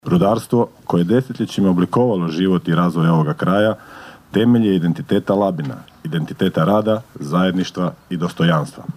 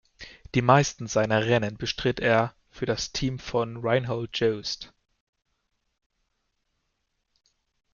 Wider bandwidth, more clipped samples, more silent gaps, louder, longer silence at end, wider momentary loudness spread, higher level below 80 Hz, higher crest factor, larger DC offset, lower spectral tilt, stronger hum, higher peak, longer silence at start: first, 14.5 kHz vs 7.2 kHz; neither; neither; first, -18 LUFS vs -26 LUFS; second, 0.05 s vs 3.05 s; second, 8 LU vs 12 LU; about the same, -54 dBFS vs -52 dBFS; second, 14 dB vs 24 dB; neither; first, -7.5 dB/octave vs -5 dB/octave; neither; about the same, -2 dBFS vs -4 dBFS; second, 0.05 s vs 0.2 s